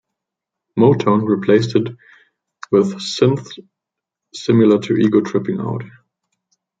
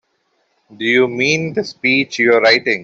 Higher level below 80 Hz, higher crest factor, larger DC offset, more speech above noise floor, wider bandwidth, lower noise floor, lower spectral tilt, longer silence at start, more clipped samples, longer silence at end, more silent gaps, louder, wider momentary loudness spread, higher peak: about the same, -60 dBFS vs -60 dBFS; about the same, 16 dB vs 14 dB; neither; first, 68 dB vs 50 dB; first, 9.2 kHz vs 7.8 kHz; first, -83 dBFS vs -65 dBFS; first, -7 dB/octave vs -4 dB/octave; about the same, 0.75 s vs 0.7 s; neither; first, 0.9 s vs 0 s; neither; about the same, -16 LUFS vs -14 LUFS; first, 13 LU vs 7 LU; about the same, -2 dBFS vs -2 dBFS